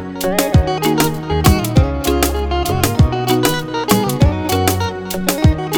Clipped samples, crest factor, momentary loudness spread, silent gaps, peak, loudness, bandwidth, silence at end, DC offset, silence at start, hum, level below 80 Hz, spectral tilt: under 0.1%; 14 dB; 5 LU; none; 0 dBFS; -16 LUFS; over 20 kHz; 0 s; under 0.1%; 0 s; none; -24 dBFS; -5 dB/octave